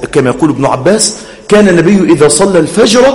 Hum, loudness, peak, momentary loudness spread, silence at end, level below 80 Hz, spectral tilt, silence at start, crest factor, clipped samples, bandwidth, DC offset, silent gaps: none; -7 LUFS; 0 dBFS; 5 LU; 0 s; -36 dBFS; -4.5 dB/octave; 0 s; 8 dB; 3%; over 20 kHz; under 0.1%; none